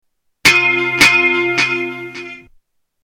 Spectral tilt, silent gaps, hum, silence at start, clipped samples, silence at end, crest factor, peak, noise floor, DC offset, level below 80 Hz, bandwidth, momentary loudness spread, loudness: -2 dB/octave; none; none; 0.45 s; under 0.1%; 0.65 s; 16 dB; -2 dBFS; -55 dBFS; under 0.1%; -48 dBFS; 18 kHz; 19 LU; -11 LUFS